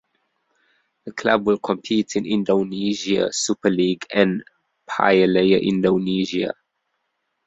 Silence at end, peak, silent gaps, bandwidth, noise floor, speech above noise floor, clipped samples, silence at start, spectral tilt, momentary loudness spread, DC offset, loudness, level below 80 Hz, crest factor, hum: 0.95 s; -2 dBFS; none; 8.4 kHz; -74 dBFS; 55 dB; under 0.1%; 1.05 s; -5 dB/octave; 10 LU; under 0.1%; -20 LUFS; -58 dBFS; 20 dB; none